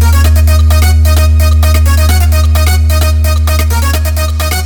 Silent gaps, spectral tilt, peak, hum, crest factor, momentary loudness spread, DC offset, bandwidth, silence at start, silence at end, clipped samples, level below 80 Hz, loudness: none; -5 dB/octave; 0 dBFS; none; 6 dB; 4 LU; under 0.1%; 19 kHz; 0 s; 0 s; under 0.1%; -8 dBFS; -9 LUFS